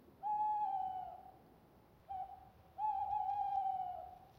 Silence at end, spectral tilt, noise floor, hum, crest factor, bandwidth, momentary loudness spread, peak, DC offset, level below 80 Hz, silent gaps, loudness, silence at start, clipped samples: 0.05 s; -6 dB/octave; -66 dBFS; none; 12 dB; 16 kHz; 17 LU; -30 dBFS; under 0.1%; -72 dBFS; none; -41 LUFS; 0 s; under 0.1%